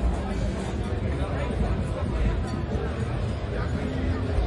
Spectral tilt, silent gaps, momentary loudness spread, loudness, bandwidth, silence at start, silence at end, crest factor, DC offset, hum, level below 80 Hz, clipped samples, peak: -7.5 dB/octave; none; 2 LU; -29 LUFS; 11 kHz; 0 s; 0 s; 14 dB; under 0.1%; none; -30 dBFS; under 0.1%; -12 dBFS